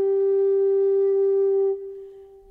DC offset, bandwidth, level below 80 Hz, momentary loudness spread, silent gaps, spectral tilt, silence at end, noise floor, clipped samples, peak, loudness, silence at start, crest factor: under 0.1%; 2.1 kHz; -68 dBFS; 12 LU; none; -8.5 dB/octave; 0.25 s; -43 dBFS; under 0.1%; -16 dBFS; -21 LUFS; 0 s; 6 dB